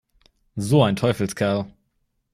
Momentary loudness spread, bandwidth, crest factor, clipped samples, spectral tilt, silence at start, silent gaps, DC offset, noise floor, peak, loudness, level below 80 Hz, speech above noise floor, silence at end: 16 LU; 15 kHz; 18 dB; under 0.1%; -6.5 dB/octave; 0.55 s; none; under 0.1%; -71 dBFS; -6 dBFS; -21 LUFS; -54 dBFS; 51 dB; 0.65 s